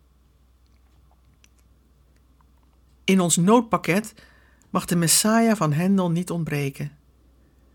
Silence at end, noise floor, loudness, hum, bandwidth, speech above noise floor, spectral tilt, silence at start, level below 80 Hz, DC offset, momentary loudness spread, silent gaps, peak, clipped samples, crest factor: 0.85 s; -58 dBFS; -21 LUFS; none; 18 kHz; 37 dB; -4.5 dB/octave; 3.05 s; -56 dBFS; under 0.1%; 13 LU; none; -4 dBFS; under 0.1%; 20 dB